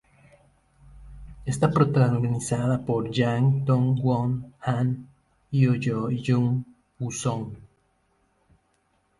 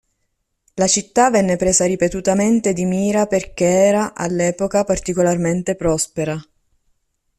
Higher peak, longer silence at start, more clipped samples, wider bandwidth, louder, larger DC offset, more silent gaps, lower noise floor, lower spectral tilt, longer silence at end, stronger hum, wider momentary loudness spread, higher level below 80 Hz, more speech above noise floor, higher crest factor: second, -6 dBFS vs -2 dBFS; first, 0.95 s vs 0.75 s; neither; second, 11.5 kHz vs 13.5 kHz; second, -25 LUFS vs -17 LUFS; neither; neither; about the same, -69 dBFS vs -71 dBFS; first, -7 dB/octave vs -4.5 dB/octave; first, 1.65 s vs 0.95 s; neither; first, 12 LU vs 6 LU; second, -52 dBFS vs -44 dBFS; second, 45 dB vs 54 dB; about the same, 20 dB vs 16 dB